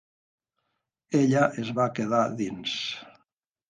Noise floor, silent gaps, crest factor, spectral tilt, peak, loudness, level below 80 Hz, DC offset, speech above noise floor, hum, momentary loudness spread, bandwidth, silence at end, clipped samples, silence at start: -80 dBFS; none; 20 dB; -5.5 dB/octave; -8 dBFS; -26 LUFS; -70 dBFS; under 0.1%; 55 dB; none; 9 LU; 9.6 kHz; 0.6 s; under 0.1%; 1.1 s